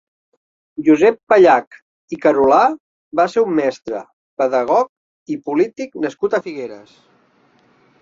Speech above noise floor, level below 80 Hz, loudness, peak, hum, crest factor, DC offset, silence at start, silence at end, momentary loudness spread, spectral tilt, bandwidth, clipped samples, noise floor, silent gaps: 40 dB; -60 dBFS; -16 LUFS; -2 dBFS; none; 16 dB; under 0.1%; 0.8 s; 1.25 s; 17 LU; -6 dB/octave; 7.6 kHz; under 0.1%; -56 dBFS; 1.23-1.27 s, 1.67-1.71 s, 1.82-2.08 s, 2.80-3.11 s, 4.13-4.37 s, 4.89-5.26 s